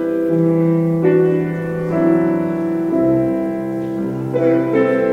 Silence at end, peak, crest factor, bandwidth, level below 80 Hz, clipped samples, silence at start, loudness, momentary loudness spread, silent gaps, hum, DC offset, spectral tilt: 0 s; -4 dBFS; 12 dB; 4.7 kHz; -52 dBFS; under 0.1%; 0 s; -17 LUFS; 7 LU; none; none; under 0.1%; -10 dB/octave